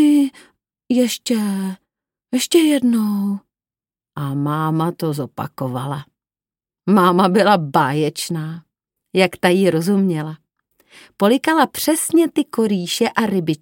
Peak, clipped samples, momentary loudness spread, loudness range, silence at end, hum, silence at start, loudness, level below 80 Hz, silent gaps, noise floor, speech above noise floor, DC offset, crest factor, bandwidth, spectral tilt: 0 dBFS; under 0.1%; 13 LU; 5 LU; 0.05 s; none; 0 s; -18 LUFS; -66 dBFS; none; under -90 dBFS; over 73 dB; under 0.1%; 18 dB; 17 kHz; -5 dB/octave